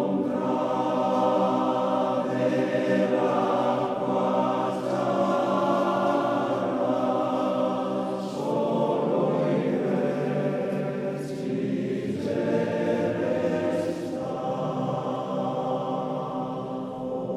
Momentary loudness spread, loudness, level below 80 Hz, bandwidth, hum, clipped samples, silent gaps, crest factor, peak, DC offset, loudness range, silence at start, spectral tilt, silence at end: 6 LU; -26 LUFS; -66 dBFS; 12.5 kHz; none; under 0.1%; none; 16 dB; -10 dBFS; under 0.1%; 3 LU; 0 s; -7.5 dB/octave; 0 s